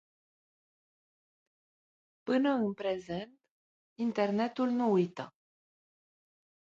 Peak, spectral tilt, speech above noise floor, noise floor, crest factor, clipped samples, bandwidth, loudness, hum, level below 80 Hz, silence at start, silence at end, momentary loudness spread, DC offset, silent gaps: -16 dBFS; -7.5 dB/octave; over 59 dB; under -90 dBFS; 18 dB; under 0.1%; 7.6 kHz; -32 LUFS; none; -76 dBFS; 2.25 s; 1.4 s; 17 LU; under 0.1%; 3.50-3.96 s